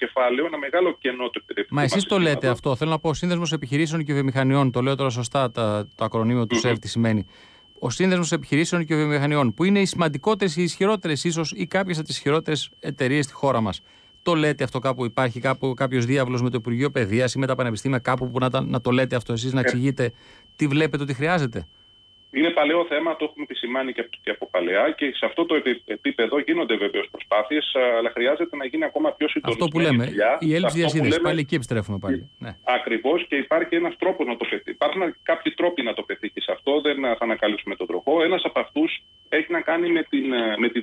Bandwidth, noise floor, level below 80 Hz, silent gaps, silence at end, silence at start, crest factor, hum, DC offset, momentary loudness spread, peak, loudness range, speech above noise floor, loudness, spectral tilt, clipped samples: 11 kHz; -54 dBFS; -56 dBFS; none; 0 s; 0 s; 14 dB; none; under 0.1%; 6 LU; -10 dBFS; 2 LU; 31 dB; -23 LUFS; -5.5 dB/octave; under 0.1%